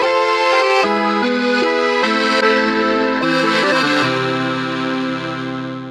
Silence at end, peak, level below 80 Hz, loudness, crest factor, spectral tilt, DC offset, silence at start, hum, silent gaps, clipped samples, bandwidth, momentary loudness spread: 0 s; -2 dBFS; -56 dBFS; -16 LUFS; 14 dB; -4.5 dB/octave; under 0.1%; 0 s; none; none; under 0.1%; 12.5 kHz; 8 LU